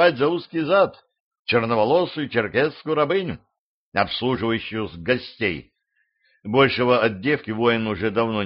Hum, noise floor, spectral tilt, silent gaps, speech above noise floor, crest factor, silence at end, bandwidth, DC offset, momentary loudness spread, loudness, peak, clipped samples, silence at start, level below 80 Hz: none; -71 dBFS; -3.5 dB/octave; 1.20-1.31 s, 1.39-1.45 s, 3.59-3.92 s; 50 dB; 18 dB; 0 s; 5.6 kHz; under 0.1%; 9 LU; -22 LUFS; -4 dBFS; under 0.1%; 0 s; -56 dBFS